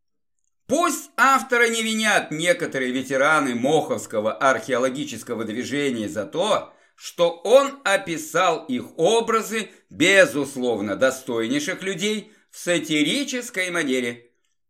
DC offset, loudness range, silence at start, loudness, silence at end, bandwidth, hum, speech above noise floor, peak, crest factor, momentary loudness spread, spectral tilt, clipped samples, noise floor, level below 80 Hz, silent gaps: under 0.1%; 4 LU; 0.7 s; -21 LUFS; 0.5 s; 16 kHz; none; 56 dB; -2 dBFS; 20 dB; 10 LU; -3 dB/octave; under 0.1%; -78 dBFS; -72 dBFS; none